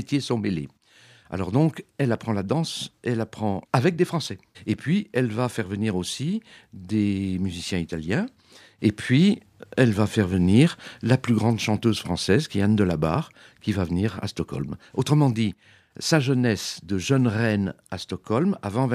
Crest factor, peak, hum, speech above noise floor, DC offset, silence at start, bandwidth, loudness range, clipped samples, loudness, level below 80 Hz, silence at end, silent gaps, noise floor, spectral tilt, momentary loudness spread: 22 dB; -2 dBFS; none; 31 dB; under 0.1%; 0 s; 14.5 kHz; 5 LU; under 0.1%; -24 LUFS; -52 dBFS; 0 s; none; -54 dBFS; -6 dB/octave; 10 LU